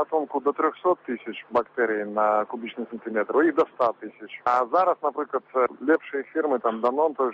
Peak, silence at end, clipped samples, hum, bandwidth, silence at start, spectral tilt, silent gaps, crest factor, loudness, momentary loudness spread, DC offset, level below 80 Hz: -8 dBFS; 0 s; under 0.1%; none; 7.4 kHz; 0 s; -3 dB/octave; none; 16 dB; -25 LUFS; 10 LU; under 0.1%; -72 dBFS